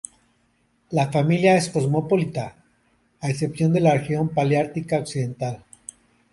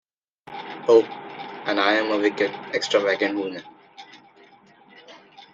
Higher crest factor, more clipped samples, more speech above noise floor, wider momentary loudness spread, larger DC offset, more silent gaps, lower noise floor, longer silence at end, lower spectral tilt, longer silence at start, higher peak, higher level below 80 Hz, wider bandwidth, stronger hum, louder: about the same, 18 dB vs 22 dB; neither; first, 44 dB vs 32 dB; about the same, 18 LU vs 18 LU; neither; neither; first, -65 dBFS vs -53 dBFS; first, 0.75 s vs 0.1 s; first, -6.5 dB/octave vs -3.5 dB/octave; first, 0.9 s vs 0.45 s; about the same, -6 dBFS vs -4 dBFS; first, -58 dBFS vs -74 dBFS; first, 11.5 kHz vs 7.8 kHz; neither; about the same, -22 LUFS vs -22 LUFS